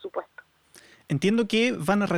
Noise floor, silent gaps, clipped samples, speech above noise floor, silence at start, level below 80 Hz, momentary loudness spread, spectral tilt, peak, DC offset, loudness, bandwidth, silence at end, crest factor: -55 dBFS; none; under 0.1%; 32 dB; 0.05 s; -60 dBFS; 13 LU; -5.5 dB/octave; -12 dBFS; under 0.1%; -25 LUFS; 15 kHz; 0 s; 16 dB